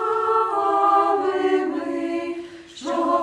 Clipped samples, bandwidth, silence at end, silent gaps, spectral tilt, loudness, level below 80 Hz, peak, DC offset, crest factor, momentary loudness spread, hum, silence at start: under 0.1%; 10.5 kHz; 0 s; none; -4.5 dB/octave; -21 LUFS; -66 dBFS; -6 dBFS; under 0.1%; 16 dB; 14 LU; none; 0 s